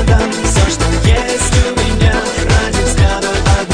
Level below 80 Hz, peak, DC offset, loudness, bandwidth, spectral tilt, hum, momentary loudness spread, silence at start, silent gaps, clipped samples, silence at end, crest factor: -16 dBFS; 0 dBFS; under 0.1%; -13 LUFS; 10 kHz; -4.5 dB/octave; none; 2 LU; 0 s; none; under 0.1%; 0 s; 10 dB